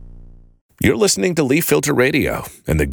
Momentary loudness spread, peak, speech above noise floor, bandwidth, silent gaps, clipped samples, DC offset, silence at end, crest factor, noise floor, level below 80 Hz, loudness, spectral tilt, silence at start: 7 LU; -2 dBFS; 24 dB; over 20 kHz; 0.61-0.69 s; under 0.1%; under 0.1%; 0 s; 16 dB; -40 dBFS; -34 dBFS; -17 LUFS; -4.5 dB/octave; 0 s